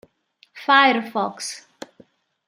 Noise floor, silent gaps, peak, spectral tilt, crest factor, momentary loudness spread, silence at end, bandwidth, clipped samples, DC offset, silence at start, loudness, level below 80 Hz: -60 dBFS; none; -2 dBFS; -2.5 dB/octave; 22 dB; 17 LU; 0.9 s; 15.5 kHz; under 0.1%; under 0.1%; 0.55 s; -19 LUFS; -78 dBFS